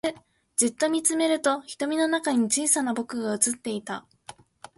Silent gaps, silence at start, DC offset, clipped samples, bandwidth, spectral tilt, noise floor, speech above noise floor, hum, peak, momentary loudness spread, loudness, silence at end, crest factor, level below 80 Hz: none; 0.05 s; under 0.1%; under 0.1%; 12 kHz; -2 dB/octave; -49 dBFS; 24 dB; none; -6 dBFS; 9 LU; -25 LUFS; 0.45 s; 20 dB; -70 dBFS